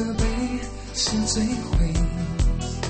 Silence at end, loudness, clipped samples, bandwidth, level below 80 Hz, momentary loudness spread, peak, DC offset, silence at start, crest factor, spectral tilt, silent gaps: 0 s; -25 LUFS; under 0.1%; 8.8 kHz; -26 dBFS; 6 LU; -8 dBFS; under 0.1%; 0 s; 16 dB; -4.5 dB/octave; none